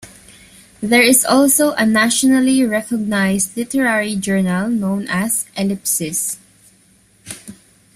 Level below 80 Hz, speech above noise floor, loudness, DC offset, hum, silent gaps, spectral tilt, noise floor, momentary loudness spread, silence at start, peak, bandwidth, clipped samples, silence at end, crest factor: -54 dBFS; 37 dB; -15 LUFS; under 0.1%; none; none; -3.5 dB/octave; -53 dBFS; 12 LU; 0.05 s; 0 dBFS; 16 kHz; under 0.1%; 0.45 s; 18 dB